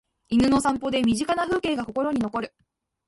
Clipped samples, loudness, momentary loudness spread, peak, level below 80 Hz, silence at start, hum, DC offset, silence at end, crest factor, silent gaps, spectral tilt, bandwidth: under 0.1%; -24 LUFS; 8 LU; -10 dBFS; -50 dBFS; 0.3 s; none; under 0.1%; 0.6 s; 16 dB; none; -5 dB/octave; 11.5 kHz